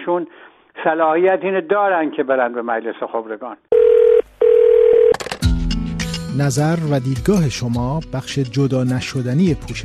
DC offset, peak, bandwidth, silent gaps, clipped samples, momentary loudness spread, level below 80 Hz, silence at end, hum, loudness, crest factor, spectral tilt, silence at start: under 0.1%; -4 dBFS; 13.5 kHz; none; under 0.1%; 12 LU; -32 dBFS; 0 s; none; -17 LUFS; 14 dB; -6.5 dB/octave; 0 s